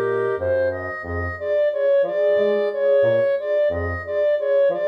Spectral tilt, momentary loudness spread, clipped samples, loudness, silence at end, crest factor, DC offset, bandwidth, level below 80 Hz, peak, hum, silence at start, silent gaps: -8 dB/octave; 8 LU; under 0.1%; -20 LUFS; 0 s; 10 dB; under 0.1%; 5.2 kHz; -46 dBFS; -10 dBFS; none; 0 s; none